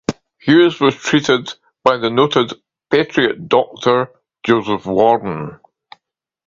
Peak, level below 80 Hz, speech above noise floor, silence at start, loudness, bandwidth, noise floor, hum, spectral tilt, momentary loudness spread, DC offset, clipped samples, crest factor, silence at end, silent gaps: 0 dBFS; -54 dBFS; 56 dB; 0.1 s; -16 LUFS; 7.6 kHz; -71 dBFS; none; -5.5 dB/octave; 12 LU; under 0.1%; under 0.1%; 16 dB; 0.95 s; none